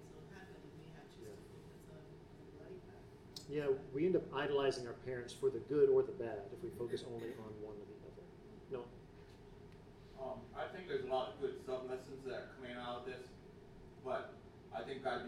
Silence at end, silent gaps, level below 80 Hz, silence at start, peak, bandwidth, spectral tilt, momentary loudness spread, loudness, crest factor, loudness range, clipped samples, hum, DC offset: 0 s; none; -68 dBFS; 0 s; -22 dBFS; 12.5 kHz; -6 dB/octave; 22 LU; -41 LUFS; 22 dB; 14 LU; under 0.1%; none; under 0.1%